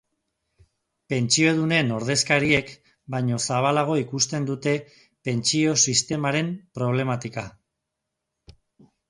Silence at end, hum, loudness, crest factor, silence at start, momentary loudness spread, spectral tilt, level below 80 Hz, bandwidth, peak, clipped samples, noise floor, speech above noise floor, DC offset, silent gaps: 0.6 s; none; -23 LUFS; 20 dB; 1.1 s; 11 LU; -3.5 dB/octave; -58 dBFS; 11.5 kHz; -6 dBFS; under 0.1%; -82 dBFS; 59 dB; under 0.1%; none